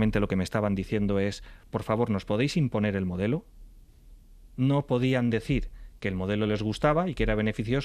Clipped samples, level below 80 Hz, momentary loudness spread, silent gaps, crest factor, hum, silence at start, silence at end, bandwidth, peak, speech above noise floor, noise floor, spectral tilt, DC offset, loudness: under 0.1%; -42 dBFS; 8 LU; none; 16 dB; none; 0 s; 0 s; 13.5 kHz; -12 dBFS; 25 dB; -52 dBFS; -7 dB/octave; under 0.1%; -28 LUFS